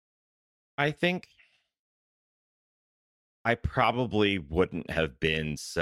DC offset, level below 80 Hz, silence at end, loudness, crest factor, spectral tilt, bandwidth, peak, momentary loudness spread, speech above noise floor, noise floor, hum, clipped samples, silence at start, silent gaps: under 0.1%; -48 dBFS; 0 s; -29 LUFS; 22 dB; -5.5 dB/octave; 14.5 kHz; -8 dBFS; 7 LU; over 62 dB; under -90 dBFS; none; under 0.1%; 0.8 s; 1.79-3.45 s